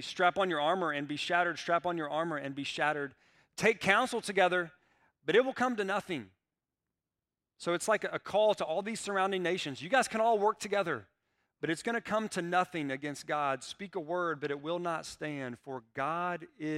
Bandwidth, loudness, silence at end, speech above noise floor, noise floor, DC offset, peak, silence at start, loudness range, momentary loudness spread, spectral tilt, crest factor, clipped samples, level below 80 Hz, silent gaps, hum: 15.5 kHz; -32 LUFS; 0 s; over 58 dB; under -90 dBFS; under 0.1%; -10 dBFS; 0 s; 4 LU; 11 LU; -4 dB/octave; 22 dB; under 0.1%; -74 dBFS; none; none